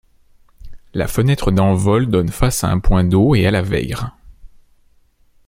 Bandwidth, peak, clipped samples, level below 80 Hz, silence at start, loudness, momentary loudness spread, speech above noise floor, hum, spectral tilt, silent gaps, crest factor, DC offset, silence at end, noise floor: 16.5 kHz; 0 dBFS; under 0.1%; -28 dBFS; 0.65 s; -16 LUFS; 11 LU; 39 dB; none; -6.5 dB/octave; none; 16 dB; under 0.1%; 1 s; -53 dBFS